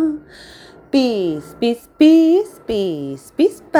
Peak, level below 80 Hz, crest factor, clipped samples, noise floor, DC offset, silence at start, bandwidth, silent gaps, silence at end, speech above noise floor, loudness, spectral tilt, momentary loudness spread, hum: -2 dBFS; -52 dBFS; 16 dB; under 0.1%; -42 dBFS; under 0.1%; 0 s; 13.5 kHz; none; 0 s; 26 dB; -17 LUFS; -6 dB/octave; 12 LU; none